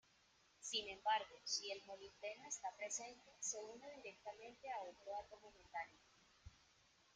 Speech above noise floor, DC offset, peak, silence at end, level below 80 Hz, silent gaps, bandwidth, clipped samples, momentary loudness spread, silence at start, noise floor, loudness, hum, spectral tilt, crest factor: 26 dB; under 0.1%; -28 dBFS; 0.5 s; -80 dBFS; none; 10 kHz; under 0.1%; 15 LU; 0.6 s; -75 dBFS; -48 LUFS; none; 0 dB/octave; 22 dB